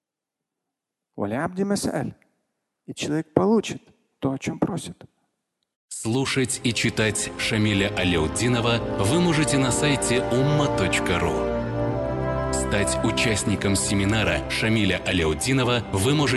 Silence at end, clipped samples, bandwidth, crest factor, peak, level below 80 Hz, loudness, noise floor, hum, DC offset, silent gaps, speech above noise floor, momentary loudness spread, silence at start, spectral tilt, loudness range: 0 s; under 0.1%; 12.5 kHz; 22 dB; -2 dBFS; -40 dBFS; -23 LUFS; -86 dBFS; none; under 0.1%; 5.76-5.88 s; 64 dB; 7 LU; 1.15 s; -4.5 dB/octave; 6 LU